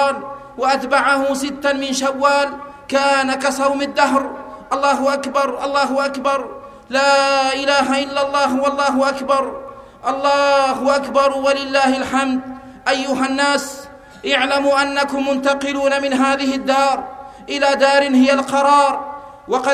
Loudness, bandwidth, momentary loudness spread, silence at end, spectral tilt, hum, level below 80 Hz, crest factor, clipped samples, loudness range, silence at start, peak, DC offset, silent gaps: -17 LUFS; 14.5 kHz; 12 LU; 0 s; -2.5 dB/octave; none; -54 dBFS; 16 dB; under 0.1%; 2 LU; 0 s; 0 dBFS; under 0.1%; none